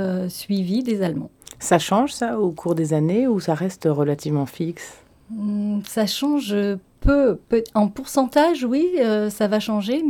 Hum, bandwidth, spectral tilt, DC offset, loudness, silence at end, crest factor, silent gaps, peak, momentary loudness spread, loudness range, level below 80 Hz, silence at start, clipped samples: none; 18 kHz; -6 dB/octave; under 0.1%; -21 LUFS; 0 s; 18 dB; none; -2 dBFS; 9 LU; 3 LU; -38 dBFS; 0 s; under 0.1%